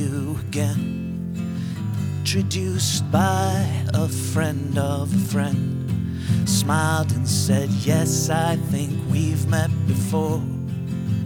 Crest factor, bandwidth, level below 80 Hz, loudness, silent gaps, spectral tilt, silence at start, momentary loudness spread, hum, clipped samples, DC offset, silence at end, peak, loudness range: 16 dB; 18 kHz; -52 dBFS; -22 LUFS; none; -5.5 dB/octave; 0 s; 7 LU; none; under 0.1%; under 0.1%; 0 s; -6 dBFS; 2 LU